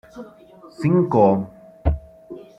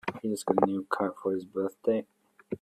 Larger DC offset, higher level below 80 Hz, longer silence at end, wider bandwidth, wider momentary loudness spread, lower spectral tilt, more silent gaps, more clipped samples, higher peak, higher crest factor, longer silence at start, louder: neither; first, -34 dBFS vs -72 dBFS; about the same, 0.15 s vs 0.05 s; second, 8.8 kHz vs 14.5 kHz; first, 24 LU vs 7 LU; first, -10 dB/octave vs -6 dB/octave; neither; neither; first, -2 dBFS vs -8 dBFS; about the same, 18 dB vs 22 dB; about the same, 0.15 s vs 0.05 s; first, -20 LUFS vs -30 LUFS